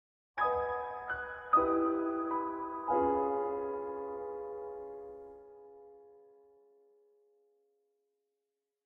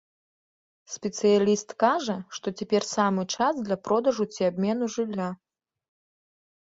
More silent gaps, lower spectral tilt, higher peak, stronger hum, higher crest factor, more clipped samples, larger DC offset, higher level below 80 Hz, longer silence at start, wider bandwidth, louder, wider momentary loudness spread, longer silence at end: neither; first, -8.5 dB/octave vs -5 dB/octave; second, -16 dBFS vs -6 dBFS; neither; about the same, 20 dB vs 20 dB; neither; neither; about the same, -66 dBFS vs -70 dBFS; second, 0.35 s vs 0.9 s; second, 5.4 kHz vs 7.8 kHz; second, -34 LUFS vs -26 LUFS; first, 20 LU vs 11 LU; first, 2.65 s vs 1.3 s